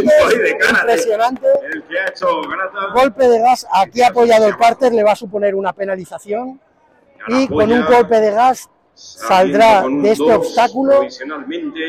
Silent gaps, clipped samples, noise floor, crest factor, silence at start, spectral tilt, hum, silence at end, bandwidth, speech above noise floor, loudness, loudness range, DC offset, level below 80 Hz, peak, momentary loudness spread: none; under 0.1%; -52 dBFS; 10 dB; 0 s; -4.5 dB/octave; none; 0 s; 15.5 kHz; 39 dB; -14 LUFS; 3 LU; under 0.1%; -50 dBFS; -4 dBFS; 13 LU